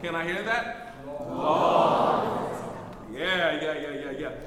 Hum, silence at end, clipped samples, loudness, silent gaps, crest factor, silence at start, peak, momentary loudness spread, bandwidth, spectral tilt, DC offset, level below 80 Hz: none; 0 s; under 0.1%; -26 LUFS; none; 18 dB; 0 s; -10 dBFS; 17 LU; 15 kHz; -5 dB/octave; under 0.1%; -54 dBFS